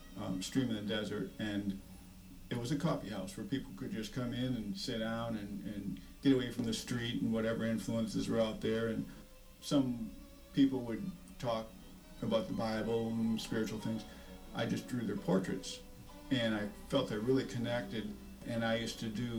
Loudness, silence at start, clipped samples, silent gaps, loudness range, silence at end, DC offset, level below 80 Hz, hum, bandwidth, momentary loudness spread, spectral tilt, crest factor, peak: -37 LUFS; 0 s; under 0.1%; none; 4 LU; 0 s; under 0.1%; -56 dBFS; none; over 20 kHz; 13 LU; -5.5 dB/octave; 18 dB; -18 dBFS